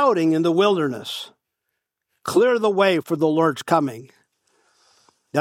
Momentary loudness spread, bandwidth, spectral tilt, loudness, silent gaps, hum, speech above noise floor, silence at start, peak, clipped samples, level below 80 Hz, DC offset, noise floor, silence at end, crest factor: 14 LU; 16 kHz; -5.5 dB/octave; -20 LUFS; none; none; 60 dB; 0 s; -4 dBFS; under 0.1%; -70 dBFS; under 0.1%; -79 dBFS; 0 s; 18 dB